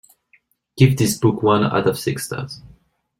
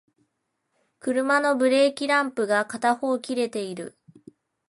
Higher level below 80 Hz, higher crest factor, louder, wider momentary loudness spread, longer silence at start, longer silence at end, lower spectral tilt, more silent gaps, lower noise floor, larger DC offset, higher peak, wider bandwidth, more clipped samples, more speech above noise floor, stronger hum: first, -50 dBFS vs -76 dBFS; about the same, 18 dB vs 18 dB; first, -18 LUFS vs -23 LUFS; about the same, 14 LU vs 13 LU; second, 0.75 s vs 1.05 s; second, 0.6 s vs 0.8 s; first, -6 dB/octave vs -3.5 dB/octave; neither; second, -60 dBFS vs -77 dBFS; neither; first, -2 dBFS vs -8 dBFS; first, 16.5 kHz vs 11.5 kHz; neither; second, 42 dB vs 54 dB; neither